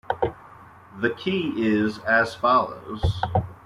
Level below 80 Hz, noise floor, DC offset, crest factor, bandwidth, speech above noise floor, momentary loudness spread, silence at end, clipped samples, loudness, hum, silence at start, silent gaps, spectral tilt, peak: -44 dBFS; -47 dBFS; under 0.1%; 18 dB; 13 kHz; 24 dB; 7 LU; 0.1 s; under 0.1%; -24 LUFS; none; 0.1 s; none; -7 dB/octave; -6 dBFS